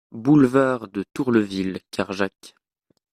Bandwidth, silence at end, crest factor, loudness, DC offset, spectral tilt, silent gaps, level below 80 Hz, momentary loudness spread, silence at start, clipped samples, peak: 13 kHz; 0.65 s; 18 dB; -21 LUFS; under 0.1%; -7 dB/octave; none; -60 dBFS; 12 LU; 0.15 s; under 0.1%; -4 dBFS